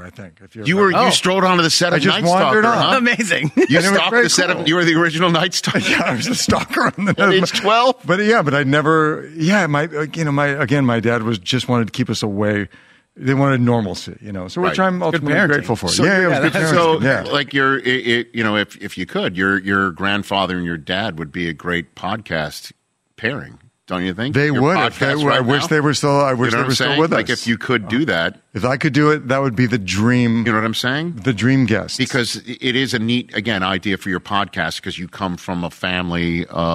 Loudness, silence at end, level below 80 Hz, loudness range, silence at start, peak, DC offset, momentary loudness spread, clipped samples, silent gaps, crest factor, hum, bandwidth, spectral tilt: -17 LUFS; 0 s; -50 dBFS; 6 LU; 0 s; -2 dBFS; under 0.1%; 9 LU; under 0.1%; none; 14 dB; none; 15.5 kHz; -4.5 dB/octave